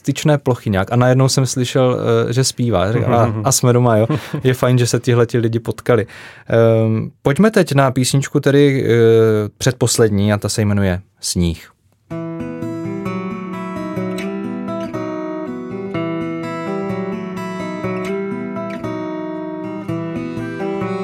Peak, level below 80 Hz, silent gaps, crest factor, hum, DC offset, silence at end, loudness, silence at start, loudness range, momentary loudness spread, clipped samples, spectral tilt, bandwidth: 0 dBFS; -46 dBFS; none; 16 dB; none; under 0.1%; 0 s; -17 LUFS; 0.05 s; 10 LU; 12 LU; under 0.1%; -5.5 dB/octave; 16.5 kHz